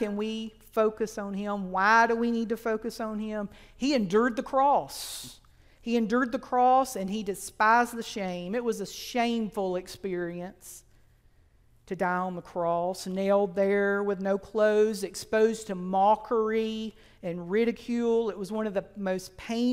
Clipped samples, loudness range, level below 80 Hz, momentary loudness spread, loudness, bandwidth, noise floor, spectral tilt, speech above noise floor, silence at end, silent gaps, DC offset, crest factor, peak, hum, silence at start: under 0.1%; 7 LU; -58 dBFS; 13 LU; -28 LUFS; 16 kHz; -61 dBFS; -5 dB/octave; 33 dB; 0 s; none; under 0.1%; 20 dB; -8 dBFS; none; 0 s